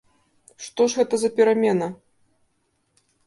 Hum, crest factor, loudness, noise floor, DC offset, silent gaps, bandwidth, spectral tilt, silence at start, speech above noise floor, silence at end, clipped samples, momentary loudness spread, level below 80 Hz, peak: none; 18 dB; -21 LUFS; -70 dBFS; under 0.1%; none; 11.5 kHz; -4.5 dB/octave; 0.6 s; 49 dB; 1.3 s; under 0.1%; 15 LU; -70 dBFS; -6 dBFS